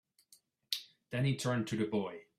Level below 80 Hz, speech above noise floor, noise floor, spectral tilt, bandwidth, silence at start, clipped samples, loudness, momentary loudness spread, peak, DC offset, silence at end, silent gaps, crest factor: -72 dBFS; 34 dB; -68 dBFS; -5.5 dB/octave; 15 kHz; 0.7 s; under 0.1%; -36 LUFS; 6 LU; -12 dBFS; under 0.1%; 0.15 s; none; 24 dB